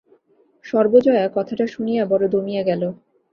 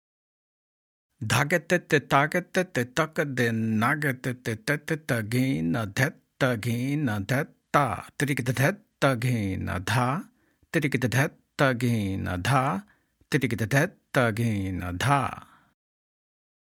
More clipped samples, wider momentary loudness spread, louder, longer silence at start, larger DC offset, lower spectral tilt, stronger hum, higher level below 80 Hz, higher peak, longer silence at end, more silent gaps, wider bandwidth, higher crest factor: neither; first, 9 LU vs 6 LU; first, -19 LUFS vs -26 LUFS; second, 0.65 s vs 1.2 s; neither; first, -8 dB/octave vs -5.5 dB/octave; neither; about the same, -62 dBFS vs -62 dBFS; first, -2 dBFS vs -6 dBFS; second, 0.4 s vs 1.35 s; neither; second, 6.8 kHz vs 17.5 kHz; about the same, 18 dB vs 22 dB